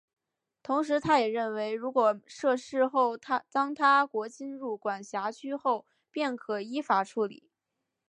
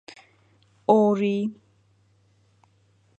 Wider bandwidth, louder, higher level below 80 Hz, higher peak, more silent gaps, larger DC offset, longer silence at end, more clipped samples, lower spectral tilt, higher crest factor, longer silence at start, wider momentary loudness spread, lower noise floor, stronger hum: first, 10.5 kHz vs 8.2 kHz; second, -29 LUFS vs -23 LUFS; about the same, -74 dBFS vs -74 dBFS; second, -12 dBFS vs -4 dBFS; neither; neither; second, 0.75 s vs 1.65 s; neither; second, -4.5 dB/octave vs -8 dB/octave; second, 18 dB vs 24 dB; second, 0.7 s vs 0.9 s; about the same, 10 LU vs 12 LU; first, -85 dBFS vs -63 dBFS; neither